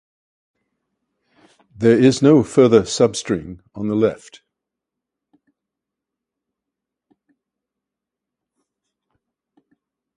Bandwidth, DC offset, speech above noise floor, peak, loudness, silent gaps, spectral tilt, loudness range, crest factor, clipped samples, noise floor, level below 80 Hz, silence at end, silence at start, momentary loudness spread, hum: 11.5 kHz; under 0.1%; 69 dB; 0 dBFS; -16 LUFS; none; -6 dB/octave; 11 LU; 20 dB; under 0.1%; -85 dBFS; -56 dBFS; 6 s; 1.8 s; 13 LU; none